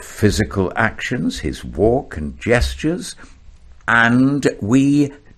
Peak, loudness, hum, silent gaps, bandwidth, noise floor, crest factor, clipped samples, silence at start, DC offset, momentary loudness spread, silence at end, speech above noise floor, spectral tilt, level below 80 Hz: 0 dBFS; -17 LUFS; none; none; 14 kHz; -42 dBFS; 18 dB; under 0.1%; 0 s; under 0.1%; 12 LU; 0.2 s; 25 dB; -5.5 dB/octave; -34 dBFS